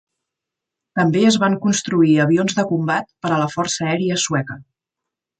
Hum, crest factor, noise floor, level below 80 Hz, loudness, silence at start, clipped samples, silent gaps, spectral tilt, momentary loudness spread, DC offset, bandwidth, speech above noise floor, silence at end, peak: none; 16 dB; -84 dBFS; -60 dBFS; -18 LUFS; 0.95 s; under 0.1%; none; -5 dB/octave; 7 LU; under 0.1%; 9.4 kHz; 66 dB; 0.75 s; -2 dBFS